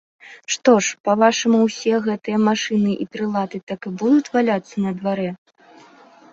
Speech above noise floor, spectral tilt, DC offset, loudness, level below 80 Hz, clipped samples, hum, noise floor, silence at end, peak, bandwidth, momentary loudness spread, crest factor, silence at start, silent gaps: 29 dB; -4.5 dB/octave; under 0.1%; -19 LUFS; -64 dBFS; under 0.1%; none; -48 dBFS; 0.95 s; -2 dBFS; 7.8 kHz; 11 LU; 18 dB; 0.25 s; 1.00-1.04 s, 3.63-3.67 s